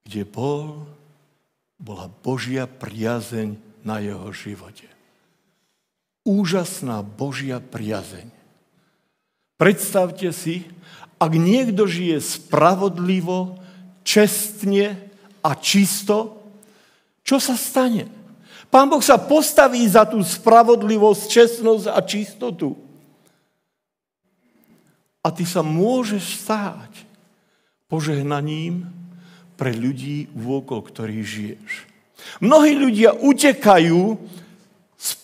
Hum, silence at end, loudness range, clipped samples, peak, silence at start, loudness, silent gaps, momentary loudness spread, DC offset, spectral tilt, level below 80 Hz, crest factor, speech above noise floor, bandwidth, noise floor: none; 0.1 s; 14 LU; under 0.1%; 0 dBFS; 0.1 s; -18 LUFS; none; 17 LU; under 0.1%; -5 dB/octave; -64 dBFS; 20 dB; 64 dB; 16 kHz; -82 dBFS